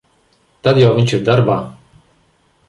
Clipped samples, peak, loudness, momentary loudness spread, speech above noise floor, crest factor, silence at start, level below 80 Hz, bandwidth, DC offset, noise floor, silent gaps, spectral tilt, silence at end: under 0.1%; -2 dBFS; -14 LUFS; 9 LU; 44 dB; 14 dB; 0.65 s; -50 dBFS; 11 kHz; under 0.1%; -57 dBFS; none; -7 dB/octave; 0.95 s